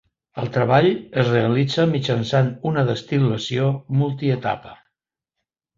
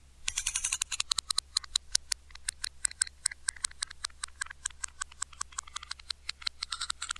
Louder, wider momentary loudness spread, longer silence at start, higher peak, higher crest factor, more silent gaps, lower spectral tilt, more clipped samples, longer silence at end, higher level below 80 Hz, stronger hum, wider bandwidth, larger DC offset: first, -20 LUFS vs -34 LUFS; about the same, 7 LU vs 9 LU; first, 0.35 s vs 0.05 s; second, -4 dBFS vs 0 dBFS; second, 18 dB vs 36 dB; neither; first, -7 dB/octave vs 3 dB/octave; neither; first, 1.05 s vs 0 s; about the same, -56 dBFS vs -54 dBFS; neither; second, 7.6 kHz vs 13.5 kHz; neither